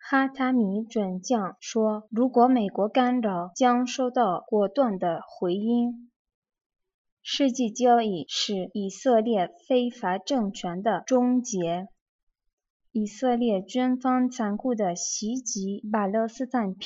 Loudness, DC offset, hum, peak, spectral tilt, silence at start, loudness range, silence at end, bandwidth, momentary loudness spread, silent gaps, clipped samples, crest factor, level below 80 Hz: -26 LUFS; under 0.1%; none; -8 dBFS; -4.5 dB/octave; 0.05 s; 4 LU; 0 s; 7.8 kHz; 8 LU; 6.16-6.25 s, 6.34-6.42 s, 6.66-6.70 s, 6.94-7.05 s, 7.12-7.17 s, 12.01-12.27 s, 12.53-12.58 s, 12.70-12.80 s; under 0.1%; 18 dB; -72 dBFS